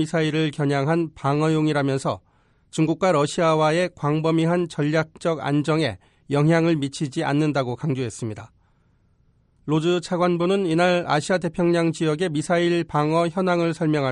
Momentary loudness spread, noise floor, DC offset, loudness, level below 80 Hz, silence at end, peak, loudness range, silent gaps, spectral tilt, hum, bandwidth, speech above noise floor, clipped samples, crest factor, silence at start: 7 LU; -61 dBFS; under 0.1%; -22 LUFS; -58 dBFS; 0 s; -6 dBFS; 4 LU; none; -6.5 dB/octave; none; 11 kHz; 40 dB; under 0.1%; 14 dB; 0 s